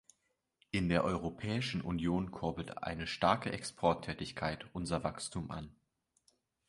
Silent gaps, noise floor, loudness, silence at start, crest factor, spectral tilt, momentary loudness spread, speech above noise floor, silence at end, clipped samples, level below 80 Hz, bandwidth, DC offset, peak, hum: none; -82 dBFS; -36 LUFS; 0.75 s; 22 dB; -5.5 dB/octave; 10 LU; 46 dB; 0.95 s; under 0.1%; -56 dBFS; 11.5 kHz; under 0.1%; -14 dBFS; none